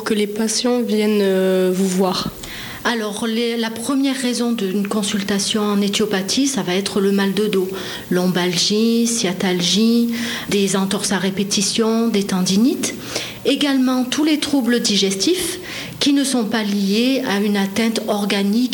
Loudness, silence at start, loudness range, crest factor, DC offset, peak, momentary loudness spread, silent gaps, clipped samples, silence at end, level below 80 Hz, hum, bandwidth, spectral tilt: -18 LUFS; 0 s; 2 LU; 12 dB; under 0.1%; -6 dBFS; 5 LU; none; under 0.1%; 0 s; -54 dBFS; none; 19.5 kHz; -4 dB/octave